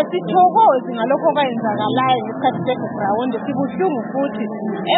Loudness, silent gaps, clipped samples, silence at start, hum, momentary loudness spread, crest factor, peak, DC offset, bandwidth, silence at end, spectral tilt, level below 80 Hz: -18 LUFS; none; under 0.1%; 0 s; none; 8 LU; 14 dB; -4 dBFS; under 0.1%; 4.1 kHz; 0 s; -11 dB/octave; -66 dBFS